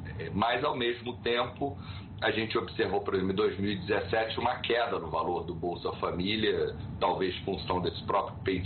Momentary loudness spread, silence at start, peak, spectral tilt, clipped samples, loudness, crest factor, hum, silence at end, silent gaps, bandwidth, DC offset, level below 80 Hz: 6 LU; 0 s; -16 dBFS; -3.5 dB/octave; under 0.1%; -31 LUFS; 16 dB; none; 0 s; none; 4.5 kHz; under 0.1%; -52 dBFS